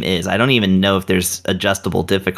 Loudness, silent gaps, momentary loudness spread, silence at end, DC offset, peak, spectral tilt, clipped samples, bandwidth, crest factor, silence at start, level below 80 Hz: -16 LUFS; none; 5 LU; 0 s; under 0.1%; -2 dBFS; -4.5 dB/octave; under 0.1%; 15 kHz; 16 dB; 0 s; -50 dBFS